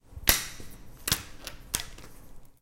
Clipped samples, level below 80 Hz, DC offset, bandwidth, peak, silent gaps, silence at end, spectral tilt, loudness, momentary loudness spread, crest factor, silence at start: under 0.1%; -44 dBFS; under 0.1%; 17 kHz; 0 dBFS; none; 0.1 s; -1 dB/octave; -29 LUFS; 22 LU; 34 dB; 0.05 s